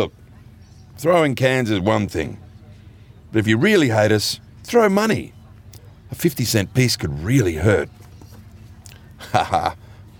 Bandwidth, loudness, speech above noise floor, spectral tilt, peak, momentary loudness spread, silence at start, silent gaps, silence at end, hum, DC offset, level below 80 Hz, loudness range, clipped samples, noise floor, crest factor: over 20 kHz; -19 LUFS; 26 dB; -5.5 dB/octave; -2 dBFS; 14 LU; 0 s; none; 0.15 s; none; under 0.1%; -48 dBFS; 3 LU; under 0.1%; -44 dBFS; 18 dB